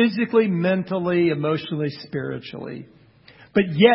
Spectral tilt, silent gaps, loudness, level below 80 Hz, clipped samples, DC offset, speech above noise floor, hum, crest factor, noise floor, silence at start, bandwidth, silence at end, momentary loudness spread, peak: -11.5 dB/octave; none; -22 LUFS; -62 dBFS; under 0.1%; under 0.1%; 30 dB; none; 22 dB; -50 dBFS; 0 s; 5.8 kHz; 0 s; 15 LU; 0 dBFS